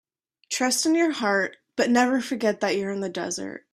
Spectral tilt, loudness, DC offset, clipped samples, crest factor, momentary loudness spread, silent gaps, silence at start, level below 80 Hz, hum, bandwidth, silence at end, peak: -3 dB/octave; -24 LUFS; under 0.1%; under 0.1%; 18 dB; 9 LU; none; 0.5 s; -68 dBFS; none; 14 kHz; 0.15 s; -8 dBFS